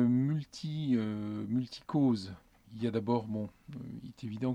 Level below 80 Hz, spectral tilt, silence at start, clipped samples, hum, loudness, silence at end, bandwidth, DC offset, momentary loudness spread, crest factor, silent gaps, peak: -66 dBFS; -8 dB/octave; 0 s; under 0.1%; none; -34 LUFS; 0 s; 9.6 kHz; under 0.1%; 16 LU; 16 dB; none; -16 dBFS